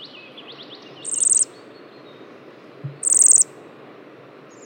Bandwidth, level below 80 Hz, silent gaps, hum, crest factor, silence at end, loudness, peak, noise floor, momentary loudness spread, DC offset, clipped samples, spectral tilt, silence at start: 17 kHz; under -90 dBFS; none; none; 20 dB; 1.2 s; -15 LUFS; -4 dBFS; -44 dBFS; 28 LU; under 0.1%; under 0.1%; -0.5 dB/octave; 0 s